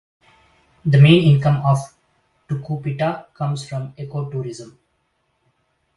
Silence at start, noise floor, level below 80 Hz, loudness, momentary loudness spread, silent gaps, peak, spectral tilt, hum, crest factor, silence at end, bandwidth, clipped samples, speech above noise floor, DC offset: 0.85 s; -68 dBFS; -54 dBFS; -18 LUFS; 18 LU; none; 0 dBFS; -7.5 dB/octave; none; 20 dB; 1.25 s; 11.5 kHz; under 0.1%; 51 dB; under 0.1%